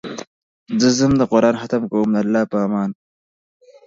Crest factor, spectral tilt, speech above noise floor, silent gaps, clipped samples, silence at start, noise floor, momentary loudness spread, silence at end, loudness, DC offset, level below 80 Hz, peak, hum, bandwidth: 18 dB; -5.5 dB/octave; over 73 dB; 0.27-0.66 s; under 0.1%; 0.05 s; under -90 dBFS; 11 LU; 0.95 s; -18 LUFS; under 0.1%; -50 dBFS; -2 dBFS; none; 7.8 kHz